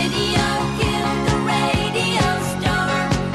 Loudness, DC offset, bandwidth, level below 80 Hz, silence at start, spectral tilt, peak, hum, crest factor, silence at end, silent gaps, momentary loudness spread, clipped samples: -19 LUFS; under 0.1%; 13 kHz; -34 dBFS; 0 s; -4.5 dB/octave; -6 dBFS; none; 14 dB; 0 s; none; 2 LU; under 0.1%